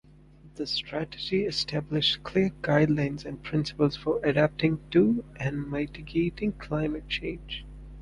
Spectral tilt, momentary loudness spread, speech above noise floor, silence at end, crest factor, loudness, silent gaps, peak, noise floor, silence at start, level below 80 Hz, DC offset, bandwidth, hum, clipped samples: -6.5 dB/octave; 10 LU; 25 dB; 0 s; 20 dB; -28 LUFS; none; -8 dBFS; -52 dBFS; 0.45 s; -48 dBFS; under 0.1%; 11 kHz; none; under 0.1%